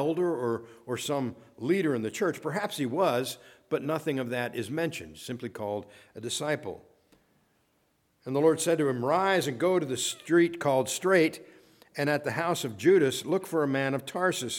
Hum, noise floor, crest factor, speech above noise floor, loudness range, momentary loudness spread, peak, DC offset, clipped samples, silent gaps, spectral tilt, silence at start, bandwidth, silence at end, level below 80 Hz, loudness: none; -71 dBFS; 18 dB; 43 dB; 8 LU; 13 LU; -10 dBFS; under 0.1%; under 0.1%; none; -4.5 dB/octave; 0 s; 17.5 kHz; 0 s; -72 dBFS; -28 LUFS